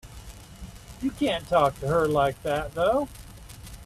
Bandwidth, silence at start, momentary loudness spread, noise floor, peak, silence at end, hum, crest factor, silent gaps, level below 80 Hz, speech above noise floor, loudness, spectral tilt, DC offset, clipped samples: 15 kHz; 0.05 s; 22 LU; -44 dBFS; -8 dBFS; 0 s; none; 18 dB; none; -46 dBFS; 19 dB; -25 LUFS; -6 dB/octave; under 0.1%; under 0.1%